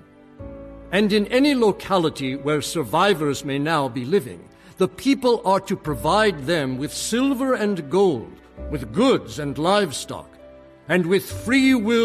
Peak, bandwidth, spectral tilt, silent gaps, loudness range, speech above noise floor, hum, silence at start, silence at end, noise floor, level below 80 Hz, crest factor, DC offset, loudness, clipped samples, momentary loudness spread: -6 dBFS; 14.5 kHz; -5 dB/octave; none; 2 LU; 25 dB; none; 0.4 s; 0 s; -46 dBFS; -46 dBFS; 16 dB; under 0.1%; -21 LUFS; under 0.1%; 13 LU